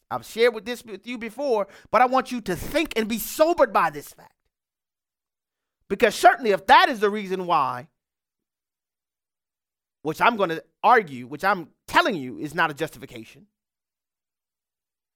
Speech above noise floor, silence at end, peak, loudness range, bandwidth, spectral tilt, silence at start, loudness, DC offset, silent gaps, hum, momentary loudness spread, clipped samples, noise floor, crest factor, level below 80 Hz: over 68 dB; 1.9 s; -2 dBFS; 7 LU; 18 kHz; -4 dB/octave; 0.1 s; -22 LUFS; under 0.1%; none; none; 16 LU; under 0.1%; under -90 dBFS; 22 dB; -54 dBFS